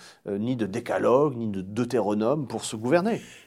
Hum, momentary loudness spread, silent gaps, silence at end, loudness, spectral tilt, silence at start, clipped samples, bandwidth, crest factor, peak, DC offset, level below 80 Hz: none; 9 LU; none; 0.05 s; -26 LUFS; -6 dB/octave; 0 s; under 0.1%; 15 kHz; 18 dB; -6 dBFS; under 0.1%; -68 dBFS